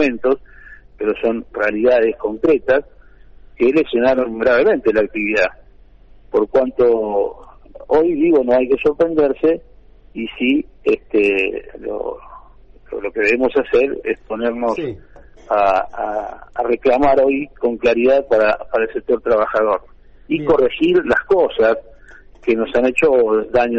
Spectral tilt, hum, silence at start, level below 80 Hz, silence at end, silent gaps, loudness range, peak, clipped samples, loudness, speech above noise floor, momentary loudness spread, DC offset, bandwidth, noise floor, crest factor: -6.5 dB/octave; none; 0 s; -44 dBFS; 0 s; none; 4 LU; -4 dBFS; under 0.1%; -17 LUFS; 28 dB; 10 LU; under 0.1%; 8.2 kHz; -44 dBFS; 14 dB